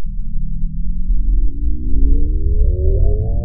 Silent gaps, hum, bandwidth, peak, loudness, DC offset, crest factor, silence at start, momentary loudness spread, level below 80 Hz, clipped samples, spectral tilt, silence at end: none; none; 0.8 kHz; 0 dBFS; -21 LUFS; 4%; 12 dB; 0 s; 9 LU; -14 dBFS; under 0.1%; -16 dB/octave; 0 s